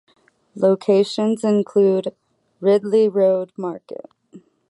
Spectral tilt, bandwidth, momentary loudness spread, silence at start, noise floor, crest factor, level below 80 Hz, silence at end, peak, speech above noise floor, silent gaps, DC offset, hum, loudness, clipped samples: -7 dB/octave; 11 kHz; 15 LU; 0.55 s; -48 dBFS; 14 dB; -72 dBFS; 0.3 s; -4 dBFS; 30 dB; none; under 0.1%; none; -19 LUFS; under 0.1%